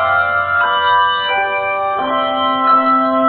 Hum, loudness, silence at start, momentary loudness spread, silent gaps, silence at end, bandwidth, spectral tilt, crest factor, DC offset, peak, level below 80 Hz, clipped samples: none; -14 LUFS; 0 s; 5 LU; none; 0 s; 4.6 kHz; -7.5 dB/octave; 12 dB; under 0.1%; -2 dBFS; -54 dBFS; under 0.1%